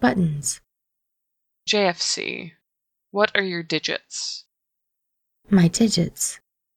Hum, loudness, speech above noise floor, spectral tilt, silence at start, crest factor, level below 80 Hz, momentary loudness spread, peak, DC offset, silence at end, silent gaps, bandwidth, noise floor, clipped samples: none; -22 LUFS; 59 dB; -4 dB/octave; 0 s; 24 dB; -56 dBFS; 15 LU; -2 dBFS; under 0.1%; 0.4 s; none; 15.5 kHz; -81 dBFS; under 0.1%